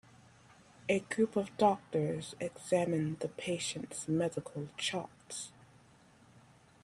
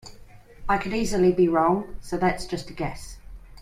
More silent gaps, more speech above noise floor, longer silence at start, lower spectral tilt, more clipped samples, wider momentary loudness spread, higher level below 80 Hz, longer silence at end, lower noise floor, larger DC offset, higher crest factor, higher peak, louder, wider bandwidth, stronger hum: neither; first, 28 dB vs 23 dB; first, 0.85 s vs 0.05 s; about the same, -5 dB/octave vs -6 dB/octave; neither; about the same, 13 LU vs 14 LU; second, -72 dBFS vs -42 dBFS; first, 1.35 s vs 0 s; first, -62 dBFS vs -47 dBFS; neither; first, 22 dB vs 16 dB; second, -14 dBFS vs -8 dBFS; second, -35 LUFS vs -24 LUFS; about the same, 14 kHz vs 14.5 kHz; neither